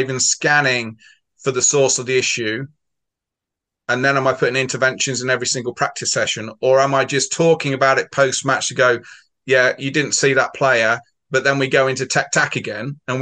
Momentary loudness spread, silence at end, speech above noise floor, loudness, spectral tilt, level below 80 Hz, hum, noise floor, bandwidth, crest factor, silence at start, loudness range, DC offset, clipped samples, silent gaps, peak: 9 LU; 0 s; 66 dB; -17 LUFS; -3 dB/octave; -64 dBFS; none; -84 dBFS; 10 kHz; 18 dB; 0 s; 3 LU; under 0.1%; under 0.1%; none; -2 dBFS